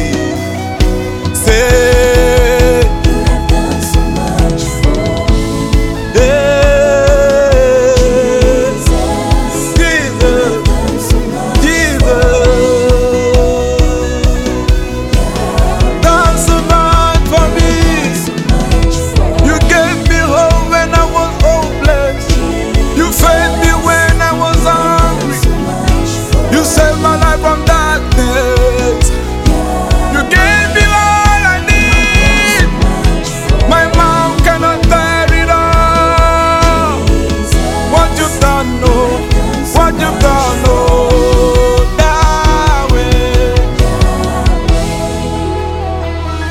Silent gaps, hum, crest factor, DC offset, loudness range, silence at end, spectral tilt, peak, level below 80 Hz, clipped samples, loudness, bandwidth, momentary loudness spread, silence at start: none; none; 10 dB; under 0.1%; 3 LU; 0 s; -5 dB/octave; 0 dBFS; -14 dBFS; under 0.1%; -10 LUFS; 16 kHz; 6 LU; 0 s